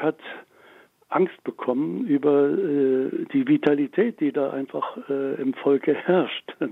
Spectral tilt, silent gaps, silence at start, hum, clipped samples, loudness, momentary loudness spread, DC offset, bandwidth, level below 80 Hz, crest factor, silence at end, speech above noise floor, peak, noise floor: -8.5 dB/octave; none; 0 s; none; under 0.1%; -23 LUFS; 9 LU; under 0.1%; 4.1 kHz; -74 dBFS; 20 dB; 0 s; 31 dB; -4 dBFS; -53 dBFS